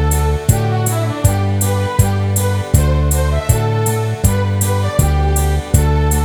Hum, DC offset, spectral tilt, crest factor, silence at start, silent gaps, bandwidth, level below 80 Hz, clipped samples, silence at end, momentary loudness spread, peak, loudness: none; under 0.1%; -5.5 dB/octave; 14 dB; 0 s; none; 18.5 kHz; -20 dBFS; under 0.1%; 0 s; 2 LU; 0 dBFS; -15 LUFS